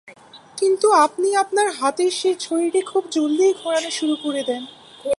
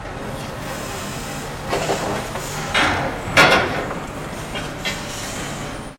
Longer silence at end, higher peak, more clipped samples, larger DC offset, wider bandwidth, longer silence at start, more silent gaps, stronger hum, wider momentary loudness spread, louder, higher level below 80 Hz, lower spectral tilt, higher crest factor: about the same, 0.05 s vs 0 s; second, -4 dBFS vs 0 dBFS; neither; neither; second, 11.5 kHz vs 17 kHz; about the same, 0.05 s vs 0 s; neither; neither; second, 10 LU vs 15 LU; about the same, -20 LUFS vs -21 LUFS; second, -72 dBFS vs -38 dBFS; second, -2 dB/octave vs -3.5 dB/octave; second, 16 dB vs 22 dB